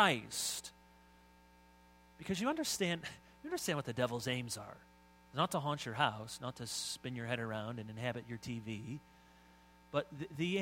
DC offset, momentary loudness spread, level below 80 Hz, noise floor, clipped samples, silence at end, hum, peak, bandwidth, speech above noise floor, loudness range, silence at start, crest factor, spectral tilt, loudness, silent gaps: under 0.1%; 11 LU; -70 dBFS; -64 dBFS; under 0.1%; 0 s; 60 Hz at -65 dBFS; -14 dBFS; 16 kHz; 25 dB; 4 LU; 0 s; 26 dB; -4 dB/octave; -39 LUFS; none